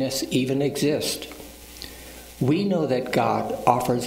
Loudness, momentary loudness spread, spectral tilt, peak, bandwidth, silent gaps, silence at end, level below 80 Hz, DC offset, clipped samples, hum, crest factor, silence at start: -23 LUFS; 17 LU; -5 dB/octave; -2 dBFS; 16 kHz; none; 0 s; -52 dBFS; under 0.1%; under 0.1%; none; 22 dB; 0 s